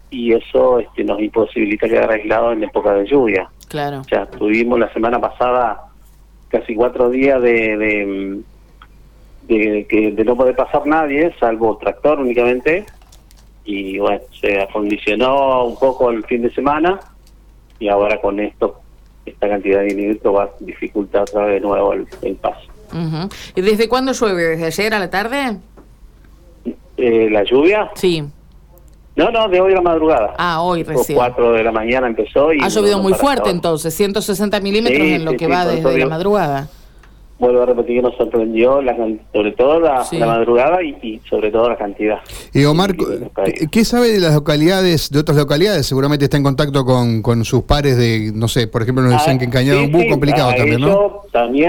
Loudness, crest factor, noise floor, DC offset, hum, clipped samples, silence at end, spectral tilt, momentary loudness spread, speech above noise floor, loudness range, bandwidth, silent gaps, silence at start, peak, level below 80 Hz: -15 LUFS; 14 dB; -44 dBFS; under 0.1%; none; under 0.1%; 0 s; -6 dB/octave; 9 LU; 29 dB; 4 LU; 18 kHz; none; 0.1 s; -2 dBFS; -38 dBFS